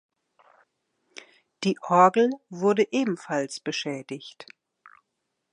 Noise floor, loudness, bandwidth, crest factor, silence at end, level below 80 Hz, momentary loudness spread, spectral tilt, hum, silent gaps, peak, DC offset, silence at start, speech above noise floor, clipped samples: -80 dBFS; -24 LUFS; 11 kHz; 22 dB; 1.1 s; -80 dBFS; 23 LU; -5 dB/octave; none; none; -4 dBFS; under 0.1%; 1.6 s; 56 dB; under 0.1%